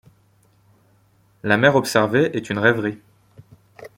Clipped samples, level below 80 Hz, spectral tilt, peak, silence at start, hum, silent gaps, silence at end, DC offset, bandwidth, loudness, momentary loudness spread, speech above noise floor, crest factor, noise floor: under 0.1%; -60 dBFS; -5.5 dB/octave; -2 dBFS; 1.45 s; none; none; 0.1 s; under 0.1%; 16.5 kHz; -19 LUFS; 13 LU; 40 dB; 20 dB; -58 dBFS